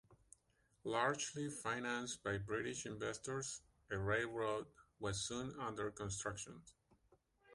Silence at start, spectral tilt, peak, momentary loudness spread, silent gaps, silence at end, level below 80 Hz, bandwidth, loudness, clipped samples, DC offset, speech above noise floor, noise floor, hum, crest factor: 0.1 s; -3.5 dB/octave; -22 dBFS; 9 LU; none; 0 s; -66 dBFS; 11.5 kHz; -43 LUFS; under 0.1%; under 0.1%; 35 dB; -78 dBFS; none; 22 dB